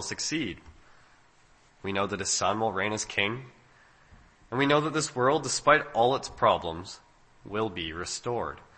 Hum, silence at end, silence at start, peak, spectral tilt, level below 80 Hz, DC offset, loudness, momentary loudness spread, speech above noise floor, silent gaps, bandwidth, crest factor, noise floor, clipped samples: none; 0.15 s; 0 s; -6 dBFS; -3.5 dB/octave; -58 dBFS; under 0.1%; -28 LUFS; 14 LU; 32 dB; none; 8.8 kHz; 24 dB; -60 dBFS; under 0.1%